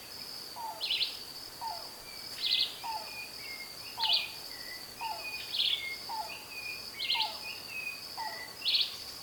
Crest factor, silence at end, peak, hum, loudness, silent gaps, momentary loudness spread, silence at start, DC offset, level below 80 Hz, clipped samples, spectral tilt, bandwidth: 20 dB; 0 s; -16 dBFS; none; -34 LUFS; none; 13 LU; 0 s; under 0.1%; -68 dBFS; under 0.1%; 0 dB/octave; 19 kHz